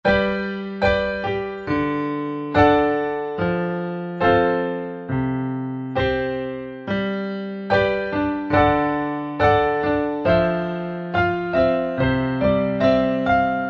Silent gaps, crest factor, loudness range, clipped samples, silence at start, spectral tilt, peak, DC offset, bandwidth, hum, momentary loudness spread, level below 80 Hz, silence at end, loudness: none; 18 dB; 3 LU; under 0.1%; 0.05 s; -8 dB/octave; -4 dBFS; under 0.1%; 7 kHz; none; 9 LU; -42 dBFS; 0 s; -21 LUFS